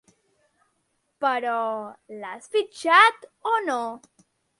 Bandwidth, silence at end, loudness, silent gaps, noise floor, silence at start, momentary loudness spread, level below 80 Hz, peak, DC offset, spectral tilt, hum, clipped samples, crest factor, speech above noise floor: 11.5 kHz; 0.65 s; -22 LUFS; none; -73 dBFS; 1.2 s; 21 LU; -80 dBFS; -4 dBFS; under 0.1%; -2 dB/octave; none; under 0.1%; 22 dB; 49 dB